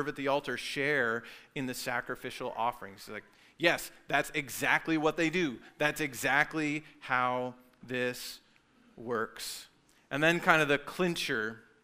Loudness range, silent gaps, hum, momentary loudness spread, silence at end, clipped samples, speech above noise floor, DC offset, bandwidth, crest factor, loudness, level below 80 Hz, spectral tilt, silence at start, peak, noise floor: 5 LU; none; none; 14 LU; 0.25 s; under 0.1%; 32 dB; under 0.1%; 16 kHz; 26 dB; -31 LUFS; -64 dBFS; -4 dB/octave; 0 s; -6 dBFS; -64 dBFS